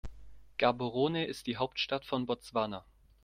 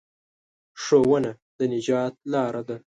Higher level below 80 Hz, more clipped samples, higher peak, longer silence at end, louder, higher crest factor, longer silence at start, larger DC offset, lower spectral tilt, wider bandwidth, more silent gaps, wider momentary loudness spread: first, -58 dBFS vs -64 dBFS; neither; second, -12 dBFS vs -6 dBFS; first, 0.45 s vs 0.1 s; second, -34 LUFS vs -24 LUFS; about the same, 22 dB vs 18 dB; second, 0.05 s vs 0.75 s; neither; about the same, -5.5 dB/octave vs -6 dB/octave; first, 15.5 kHz vs 9.2 kHz; second, none vs 1.42-1.59 s; about the same, 10 LU vs 10 LU